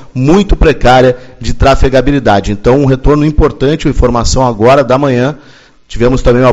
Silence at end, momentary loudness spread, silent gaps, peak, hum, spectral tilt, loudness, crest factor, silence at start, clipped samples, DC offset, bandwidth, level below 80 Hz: 0 s; 6 LU; none; 0 dBFS; none; -6.5 dB/octave; -9 LUFS; 8 dB; 0 s; 2%; under 0.1%; 8.6 kHz; -16 dBFS